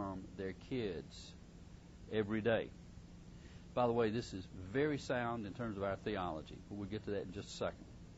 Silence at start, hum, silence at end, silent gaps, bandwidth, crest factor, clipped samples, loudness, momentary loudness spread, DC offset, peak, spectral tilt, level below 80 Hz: 0 s; none; 0 s; none; 7.6 kHz; 20 dB; under 0.1%; -41 LUFS; 20 LU; under 0.1%; -22 dBFS; -5 dB/octave; -60 dBFS